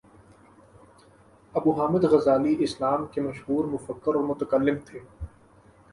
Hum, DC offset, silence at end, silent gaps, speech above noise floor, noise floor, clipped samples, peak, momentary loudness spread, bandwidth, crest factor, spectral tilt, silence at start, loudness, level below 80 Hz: none; under 0.1%; 0.65 s; none; 31 dB; -56 dBFS; under 0.1%; -8 dBFS; 20 LU; 11.5 kHz; 18 dB; -7.5 dB/octave; 1.55 s; -25 LUFS; -54 dBFS